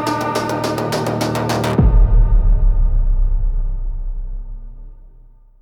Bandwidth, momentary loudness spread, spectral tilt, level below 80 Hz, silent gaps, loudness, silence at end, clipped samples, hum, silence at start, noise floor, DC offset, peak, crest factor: 13.5 kHz; 15 LU; -6 dB/octave; -16 dBFS; none; -19 LUFS; 0.55 s; under 0.1%; none; 0 s; -44 dBFS; under 0.1%; -4 dBFS; 12 dB